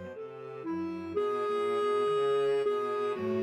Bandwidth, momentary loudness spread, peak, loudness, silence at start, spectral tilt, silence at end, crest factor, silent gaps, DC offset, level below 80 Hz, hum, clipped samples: 9.6 kHz; 13 LU; -20 dBFS; -31 LUFS; 0 s; -6 dB/octave; 0 s; 10 dB; none; under 0.1%; -76 dBFS; none; under 0.1%